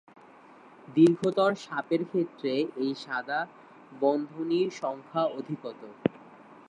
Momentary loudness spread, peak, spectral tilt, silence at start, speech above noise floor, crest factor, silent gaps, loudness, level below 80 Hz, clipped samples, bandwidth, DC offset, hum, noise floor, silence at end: 12 LU; -8 dBFS; -6.5 dB/octave; 0.9 s; 25 dB; 22 dB; none; -29 LUFS; -76 dBFS; under 0.1%; 10 kHz; under 0.1%; none; -53 dBFS; 0.15 s